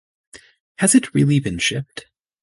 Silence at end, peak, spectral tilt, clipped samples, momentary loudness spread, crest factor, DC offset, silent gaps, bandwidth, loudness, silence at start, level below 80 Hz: 0.4 s; -2 dBFS; -4.5 dB/octave; under 0.1%; 17 LU; 18 dB; under 0.1%; 0.60-0.75 s; 12 kHz; -18 LUFS; 0.35 s; -50 dBFS